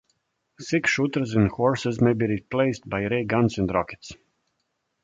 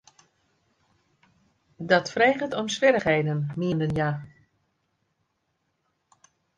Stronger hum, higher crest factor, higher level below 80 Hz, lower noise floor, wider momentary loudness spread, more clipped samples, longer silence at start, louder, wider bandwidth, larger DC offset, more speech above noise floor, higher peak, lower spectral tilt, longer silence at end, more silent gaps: neither; about the same, 18 dB vs 22 dB; first, -50 dBFS vs -60 dBFS; about the same, -76 dBFS vs -75 dBFS; about the same, 9 LU vs 8 LU; neither; second, 0.6 s vs 1.8 s; about the same, -24 LUFS vs -24 LUFS; second, 8 kHz vs 10 kHz; neither; about the same, 53 dB vs 52 dB; about the same, -8 dBFS vs -6 dBFS; about the same, -6.5 dB/octave vs -5.5 dB/octave; second, 0.9 s vs 2.3 s; neither